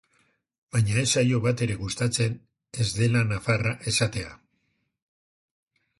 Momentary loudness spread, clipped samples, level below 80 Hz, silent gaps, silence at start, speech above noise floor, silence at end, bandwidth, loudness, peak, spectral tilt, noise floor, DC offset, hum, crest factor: 9 LU; under 0.1%; -52 dBFS; none; 0.75 s; 49 dB; 1.65 s; 11.5 kHz; -25 LUFS; -8 dBFS; -4.5 dB/octave; -74 dBFS; under 0.1%; none; 18 dB